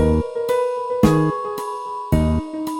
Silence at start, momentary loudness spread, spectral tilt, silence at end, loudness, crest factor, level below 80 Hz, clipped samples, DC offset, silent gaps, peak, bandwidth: 0 s; 10 LU; -7.5 dB/octave; 0 s; -20 LUFS; 18 dB; -30 dBFS; under 0.1%; under 0.1%; none; -2 dBFS; 17 kHz